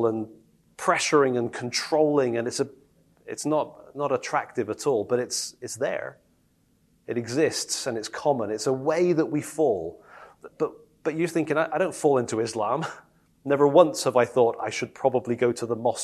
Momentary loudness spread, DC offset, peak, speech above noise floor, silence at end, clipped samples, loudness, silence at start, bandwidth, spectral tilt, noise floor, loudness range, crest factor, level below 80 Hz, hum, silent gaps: 11 LU; under 0.1%; -2 dBFS; 40 dB; 0 s; under 0.1%; -25 LUFS; 0 s; 13 kHz; -4.5 dB/octave; -65 dBFS; 5 LU; 24 dB; -70 dBFS; none; none